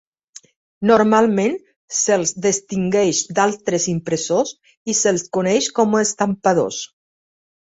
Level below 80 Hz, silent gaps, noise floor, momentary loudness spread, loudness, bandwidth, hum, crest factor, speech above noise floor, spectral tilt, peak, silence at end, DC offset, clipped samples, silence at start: -58 dBFS; 1.76-1.88 s, 4.77-4.85 s; -46 dBFS; 9 LU; -18 LUFS; 8.2 kHz; none; 18 dB; 28 dB; -4 dB/octave; -2 dBFS; 0.8 s; under 0.1%; under 0.1%; 0.8 s